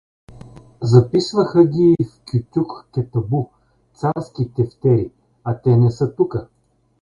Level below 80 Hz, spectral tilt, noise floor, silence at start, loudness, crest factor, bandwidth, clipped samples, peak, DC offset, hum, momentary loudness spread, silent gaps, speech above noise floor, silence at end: -48 dBFS; -8.5 dB/octave; -41 dBFS; 0.3 s; -18 LUFS; 18 dB; 7.4 kHz; under 0.1%; 0 dBFS; under 0.1%; none; 12 LU; none; 24 dB; 0.6 s